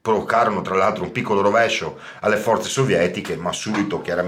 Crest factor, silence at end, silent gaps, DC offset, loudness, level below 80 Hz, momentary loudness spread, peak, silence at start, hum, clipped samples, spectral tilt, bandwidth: 14 dB; 0 s; none; under 0.1%; -20 LUFS; -56 dBFS; 7 LU; -6 dBFS; 0.05 s; none; under 0.1%; -4.5 dB/octave; 16.5 kHz